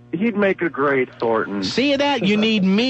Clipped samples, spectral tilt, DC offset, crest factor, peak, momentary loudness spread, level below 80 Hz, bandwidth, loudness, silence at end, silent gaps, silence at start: under 0.1%; -5.5 dB/octave; under 0.1%; 12 dB; -8 dBFS; 4 LU; -58 dBFS; 8.4 kHz; -19 LUFS; 0 s; none; 0.15 s